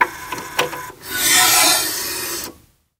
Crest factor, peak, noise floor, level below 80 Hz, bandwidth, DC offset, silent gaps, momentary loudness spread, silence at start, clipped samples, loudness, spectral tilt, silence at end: 18 dB; 0 dBFS; -47 dBFS; -52 dBFS; 16 kHz; under 0.1%; none; 17 LU; 0 s; under 0.1%; -15 LUFS; 0.5 dB/octave; 0.45 s